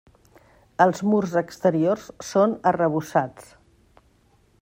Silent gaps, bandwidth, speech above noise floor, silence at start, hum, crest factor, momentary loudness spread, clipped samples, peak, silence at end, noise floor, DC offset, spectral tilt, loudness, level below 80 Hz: none; 16 kHz; 39 dB; 0.8 s; none; 22 dB; 6 LU; under 0.1%; -2 dBFS; 1.2 s; -60 dBFS; under 0.1%; -6.5 dB/octave; -22 LUFS; -62 dBFS